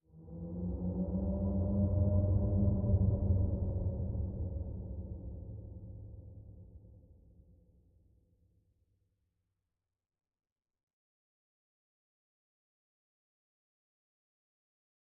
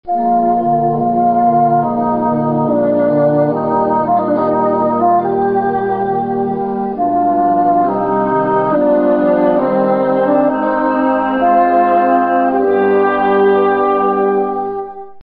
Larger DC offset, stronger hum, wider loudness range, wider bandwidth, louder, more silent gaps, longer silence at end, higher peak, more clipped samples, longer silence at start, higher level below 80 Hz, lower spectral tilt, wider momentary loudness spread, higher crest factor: neither; neither; first, 20 LU vs 2 LU; second, 1.4 kHz vs 4.8 kHz; second, -35 LUFS vs -13 LUFS; neither; first, 8.3 s vs 0 s; second, -20 dBFS vs -2 dBFS; neither; about the same, 0.15 s vs 0.05 s; about the same, -46 dBFS vs -48 dBFS; first, -15.5 dB/octave vs -10 dB/octave; first, 20 LU vs 5 LU; first, 18 dB vs 12 dB